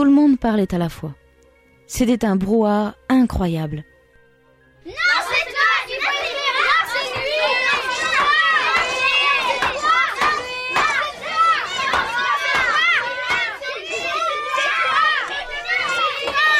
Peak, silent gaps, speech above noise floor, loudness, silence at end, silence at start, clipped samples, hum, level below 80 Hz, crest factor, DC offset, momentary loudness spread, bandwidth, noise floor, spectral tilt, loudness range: -6 dBFS; none; 36 dB; -18 LUFS; 0 s; 0 s; under 0.1%; none; -44 dBFS; 14 dB; under 0.1%; 8 LU; 15.5 kHz; -54 dBFS; -4 dB/octave; 4 LU